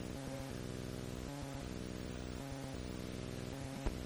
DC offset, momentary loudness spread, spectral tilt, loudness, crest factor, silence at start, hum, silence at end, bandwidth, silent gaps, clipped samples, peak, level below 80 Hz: under 0.1%; 1 LU; -5.5 dB/octave; -45 LUFS; 20 dB; 0 s; none; 0 s; over 20 kHz; none; under 0.1%; -24 dBFS; -52 dBFS